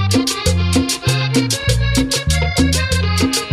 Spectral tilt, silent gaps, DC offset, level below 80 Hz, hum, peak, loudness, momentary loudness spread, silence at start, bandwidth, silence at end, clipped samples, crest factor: -4 dB/octave; none; under 0.1%; -24 dBFS; none; -4 dBFS; -16 LUFS; 1 LU; 0 s; 15.5 kHz; 0 s; under 0.1%; 12 dB